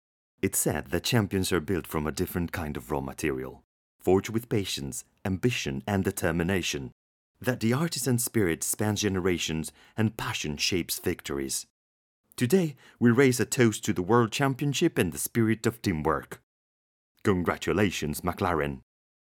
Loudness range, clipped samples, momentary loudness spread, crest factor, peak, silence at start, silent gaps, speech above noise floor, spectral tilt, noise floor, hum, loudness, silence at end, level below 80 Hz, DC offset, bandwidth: 5 LU; under 0.1%; 9 LU; 20 dB; -8 dBFS; 0.45 s; 3.64-3.99 s, 6.92-7.34 s, 11.70-12.24 s, 16.43-17.15 s; over 63 dB; -4.5 dB/octave; under -90 dBFS; none; -28 LUFS; 0.55 s; -54 dBFS; under 0.1%; 18 kHz